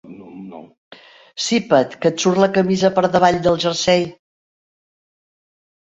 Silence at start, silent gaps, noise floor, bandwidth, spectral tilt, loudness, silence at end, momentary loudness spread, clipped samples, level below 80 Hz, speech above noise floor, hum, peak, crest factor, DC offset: 0.05 s; 0.78-0.91 s; -36 dBFS; 8.2 kHz; -4.5 dB/octave; -17 LUFS; 1.8 s; 21 LU; under 0.1%; -54 dBFS; 20 dB; none; -2 dBFS; 18 dB; under 0.1%